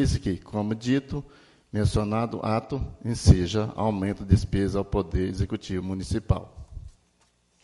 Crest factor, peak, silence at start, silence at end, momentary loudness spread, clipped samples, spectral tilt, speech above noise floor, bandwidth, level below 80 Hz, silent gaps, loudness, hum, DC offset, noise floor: 22 dB; -4 dBFS; 0 s; 0.75 s; 12 LU; under 0.1%; -7 dB/octave; 41 dB; 11.5 kHz; -36 dBFS; none; -27 LUFS; none; under 0.1%; -66 dBFS